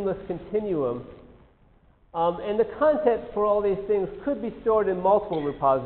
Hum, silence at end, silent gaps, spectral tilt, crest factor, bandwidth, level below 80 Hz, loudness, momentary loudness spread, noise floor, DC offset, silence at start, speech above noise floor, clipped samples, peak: none; 0 s; none; -6 dB/octave; 16 dB; 4.3 kHz; -52 dBFS; -25 LUFS; 8 LU; -58 dBFS; under 0.1%; 0 s; 34 dB; under 0.1%; -8 dBFS